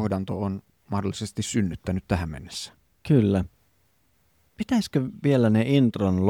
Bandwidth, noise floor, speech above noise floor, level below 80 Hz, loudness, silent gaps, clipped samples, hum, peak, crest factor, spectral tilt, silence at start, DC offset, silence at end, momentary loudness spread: 15.5 kHz; -67 dBFS; 43 dB; -48 dBFS; -25 LUFS; none; under 0.1%; none; -8 dBFS; 18 dB; -6.5 dB/octave; 0 s; under 0.1%; 0 s; 15 LU